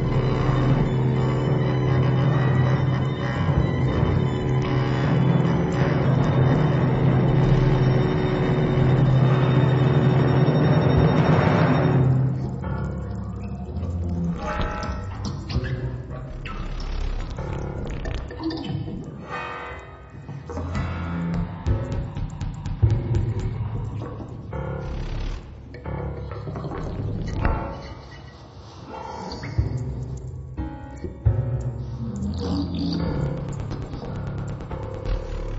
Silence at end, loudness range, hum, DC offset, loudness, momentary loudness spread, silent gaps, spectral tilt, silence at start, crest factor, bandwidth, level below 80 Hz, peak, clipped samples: 0 s; 12 LU; none; under 0.1%; -24 LUFS; 15 LU; none; -8.5 dB/octave; 0 s; 16 dB; 7.6 kHz; -34 dBFS; -6 dBFS; under 0.1%